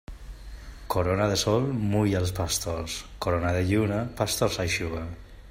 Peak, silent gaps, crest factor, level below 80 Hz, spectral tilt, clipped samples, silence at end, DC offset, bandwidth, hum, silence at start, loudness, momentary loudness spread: -10 dBFS; none; 18 dB; -44 dBFS; -5 dB/octave; under 0.1%; 0 s; under 0.1%; 16 kHz; none; 0.1 s; -27 LUFS; 20 LU